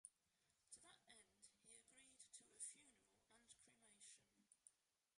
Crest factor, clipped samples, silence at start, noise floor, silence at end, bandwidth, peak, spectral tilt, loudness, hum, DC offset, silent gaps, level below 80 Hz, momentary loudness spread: 26 dB; under 0.1%; 0.05 s; -87 dBFS; 0.2 s; 11.5 kHz; -42 dBFS; 0 dB/octave; -63 LUFS; none; under 0.1%; none; under -90 dBFS; 12 LU